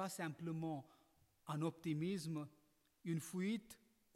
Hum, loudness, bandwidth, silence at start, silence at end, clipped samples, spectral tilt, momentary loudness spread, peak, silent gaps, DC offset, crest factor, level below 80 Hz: none; -45 LUFS; 16 kHz; 0 s; 0.4 s; under 0.1%; -6 dB/octave; 13 LU; -30 dBFS; none; under 0.1%; 14 dB; -84 dBFS